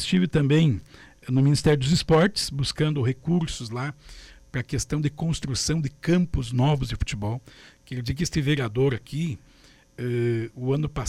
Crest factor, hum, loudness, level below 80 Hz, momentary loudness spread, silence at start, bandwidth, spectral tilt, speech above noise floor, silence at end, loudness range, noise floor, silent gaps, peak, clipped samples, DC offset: 14 dB; none; -25 LUFS; -42 dBFS; 13 LU; 0 s; 13 kHz; -6 dB/octave; 31 dB; 0 s; 5 LU; -55 dBFS; none; -10 dBFS; under 0.1%; under 0.1%